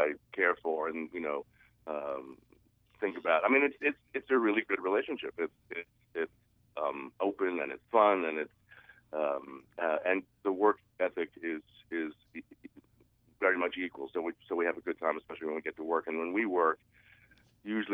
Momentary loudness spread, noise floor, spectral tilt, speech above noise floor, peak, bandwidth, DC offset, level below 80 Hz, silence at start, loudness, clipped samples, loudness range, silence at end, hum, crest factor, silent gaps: 14 LU; -67 dBFS; -7 dB/octave; 35 dB; -12 dBFS; 3.9 kHz; under 0.1%; -76 dBFS; 0 s; -33 LUFS; under 0.1%; 5 LU; 0 s; none; 22 dB; none